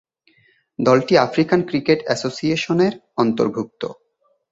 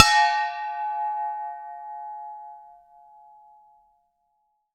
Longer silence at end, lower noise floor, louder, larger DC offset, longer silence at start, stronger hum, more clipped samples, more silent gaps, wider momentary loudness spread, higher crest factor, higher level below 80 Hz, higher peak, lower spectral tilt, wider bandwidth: second, 0.6 s vs 2.05 s; second, -65 dBFS vs -72 dBFS; first, -19 LUFS vs -26 LUFS; neither; first, 0.8 s vs 0 s; neither; neither; neither; second, 12 LU vs 21 LU; second, 18 dB vs 26 dB; first, -58 dBFS vs -66 dBFS; about the same, -2 dBFS vs 0 dBFS; first, -6 dB/octave vs 0.5 dB/octave; second, 8 kHz vs 16.5 kHz